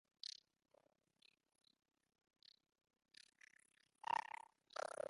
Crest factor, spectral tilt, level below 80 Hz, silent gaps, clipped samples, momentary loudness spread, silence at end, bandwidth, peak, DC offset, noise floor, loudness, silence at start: 26 dB; -0.5 dB/octave; under -90 dBFS; none; under 0.1%; 24 LU; 0.1 s; 11.5 kHz; -30 dBFS; under 0.1%; -79 dBFS; -49 LUFS; 0.25 s